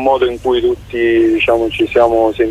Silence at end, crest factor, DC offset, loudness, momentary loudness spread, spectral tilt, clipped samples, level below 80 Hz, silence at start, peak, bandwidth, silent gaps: 0 s; 12 dB; under 0.1%; -13 LUFS; 4 LU; -6 dB/octave; under 0.1%; -38 dBFS; 0 s; 0 dBFS; 10.5 kHz; none